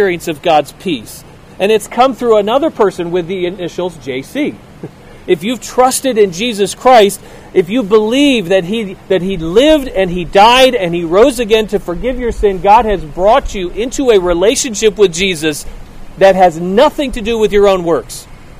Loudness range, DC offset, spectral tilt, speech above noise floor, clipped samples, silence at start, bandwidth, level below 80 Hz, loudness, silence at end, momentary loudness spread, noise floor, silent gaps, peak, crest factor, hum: 5 LU; under 0.1%; -4 dB/octave; 20 dB; 0.5%; 0 s; 16 kHz; -30 dBFS; -12 LUFS; 0 s; 12 LU; -31 dBFS; none; 0 dBFS; 12 dB; none